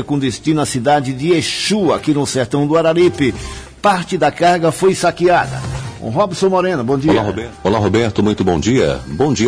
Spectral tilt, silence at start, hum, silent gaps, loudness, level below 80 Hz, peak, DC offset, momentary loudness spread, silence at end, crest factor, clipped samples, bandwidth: -5.5 dB/octave; 0 s; none; none; -15 LUFS; -38 dBFS; -2 dBFS; under 0.1%; 5 LU; 0 s; 12 dB; under 0.1%; 11 kHz